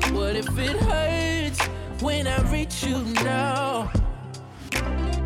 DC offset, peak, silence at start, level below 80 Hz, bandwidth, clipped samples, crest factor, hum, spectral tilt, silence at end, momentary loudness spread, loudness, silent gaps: under 0.1%; -14 dBFS; 0 s; -30 dBFS; 16.5 kHz; under 0.1%; 12 dB; none; -5 dB/octave; 0 s; 6 LU; -25 LUFS; none